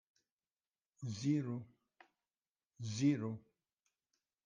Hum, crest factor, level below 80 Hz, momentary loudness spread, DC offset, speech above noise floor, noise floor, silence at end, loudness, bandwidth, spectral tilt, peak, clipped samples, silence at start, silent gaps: none; 20 dB; -82 dBFS; 14 LU; under 0.1%; over 52 dB; under -90 dBFS; 1.05 s; -39 LUFS; 9.6 kHz; -6.5 dB/octave; -22 dBFS; under 0.1%; 1 s; 2.49-2.53 s